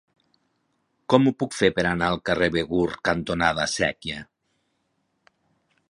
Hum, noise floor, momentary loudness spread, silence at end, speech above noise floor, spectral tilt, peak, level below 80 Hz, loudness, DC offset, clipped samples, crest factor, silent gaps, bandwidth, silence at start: none; -73 dBFS; 10 LU; 1.65 s; 50 dB; -5 dB/octave; -2 dBFS; -50 dBFS; -23 LUFS; under 0.1%; under 0.1%; 24 dB; none; 11.5 kHz; 1.1 s